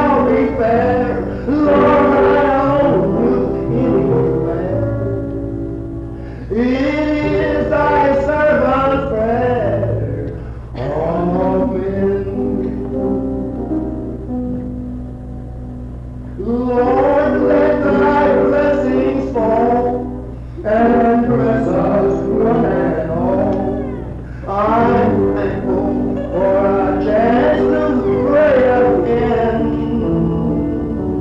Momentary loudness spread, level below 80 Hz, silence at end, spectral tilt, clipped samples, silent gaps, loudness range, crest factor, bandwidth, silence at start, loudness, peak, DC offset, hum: 13 LU; -30 dBFS; 0 s; -9 dB/octave; under 0.1%; none; 6 LU; 10 dB; 7.4 kHz; 0 s; -15 LUFS; -6 dBFS; under 0.1%; none